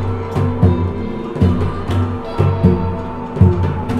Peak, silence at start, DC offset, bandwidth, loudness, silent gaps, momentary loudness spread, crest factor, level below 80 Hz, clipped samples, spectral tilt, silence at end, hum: 0 dBFS; 0 s; under 0.1%; 6 kHz; -17 LUFS; none; 9 LU; 16 dB; -32 dBFS; under 0.1%; -9.5 dB/octave; 0 s; none